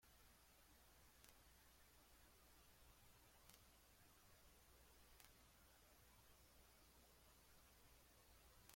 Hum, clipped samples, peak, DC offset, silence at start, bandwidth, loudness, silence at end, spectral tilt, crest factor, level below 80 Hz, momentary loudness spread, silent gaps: none; under 0.1%; -38 dBFS; under 0.1%; 0 s; 16.5 kHz; -69 LUFS; 0 s; -2.5 dB/octave; 32 dB; -76 dBFS; 1 LU; none